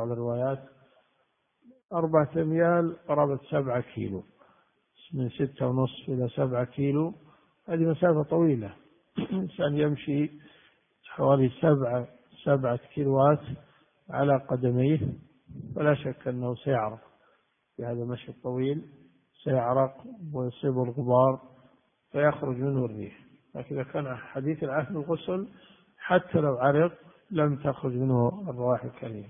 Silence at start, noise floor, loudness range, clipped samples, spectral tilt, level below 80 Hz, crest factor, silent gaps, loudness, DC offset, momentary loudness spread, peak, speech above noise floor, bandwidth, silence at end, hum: 0 s; -73 dBFS; 5 LU; under 0.1%; -12 dB/octave; -64 dBFS; 20 dB; 1.85-1.89 s; -28 LUFS; under 0.1%; 14 LU; -8 dBFS; 46 dB; 3.7 kHz; 0 s; none